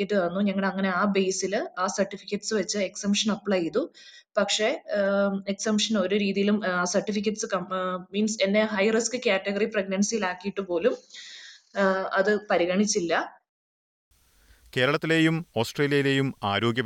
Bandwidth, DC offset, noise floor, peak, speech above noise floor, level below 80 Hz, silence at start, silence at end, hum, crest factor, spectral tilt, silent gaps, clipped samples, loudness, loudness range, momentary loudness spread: 13 kHz; under 0.1%; -59 dBFS; -10 dBFS; 34 dB; -68 dBFS; 0 s; 0 s; none; 16 dB; -4 dB/octave; 13.49-14.11 s; under 0.1%; -26 LUFS; 2 LU; 6 LU